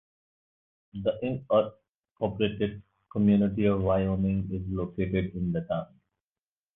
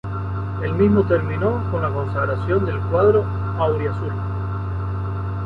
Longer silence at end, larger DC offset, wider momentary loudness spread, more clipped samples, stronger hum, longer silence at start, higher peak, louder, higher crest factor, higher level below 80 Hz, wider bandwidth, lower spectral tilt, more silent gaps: first, 0.9 s vs 0 s; neither; about the same, 10 LU vs 9 LU; neither; neither; first, 0.95 s vs 0.05 s; second, -12 dBFS vs -4 dBFS; second, -28 LUFS vs -21 LUFS; about the same, 18 dB vs 16 dB; second, -48 dBFS vs -34 dBFS; second, 3.9 kHz vs 4.8 kHz; about the same, -11 dB/octave vs -10.5 dB/octave; first, 1.89-2.03 s, 2.11-2.15 s vs none